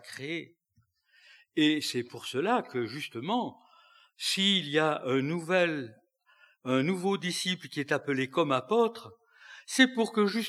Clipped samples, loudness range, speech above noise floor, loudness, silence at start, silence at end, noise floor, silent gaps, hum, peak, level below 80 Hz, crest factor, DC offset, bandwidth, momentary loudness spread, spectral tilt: under 0.1%; 3 LU; 43 dB; -29 LUFS; 0.05 s; 0 s; -72 dBFS; none; none; -8 dBFS; under -90 dBFS; 22 dB; under 0.1%; 14.5 kHz; 12 LU; -4 dB/octave